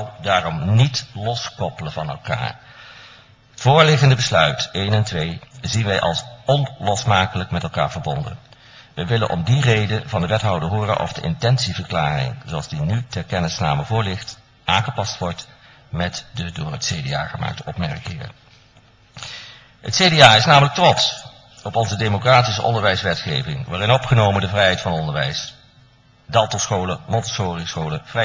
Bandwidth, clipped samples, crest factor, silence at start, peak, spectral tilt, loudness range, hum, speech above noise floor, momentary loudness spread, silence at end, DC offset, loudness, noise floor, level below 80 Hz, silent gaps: 8 kHz; under 0.1%; 20 dB; 0 s; 0 dBFS; -4.5 dB/octave; 9 LU; none; 33 dB; 14 LU; 0 s; under 0.1%; -19 LUFS; -52 dBFS; -40 dBFS; none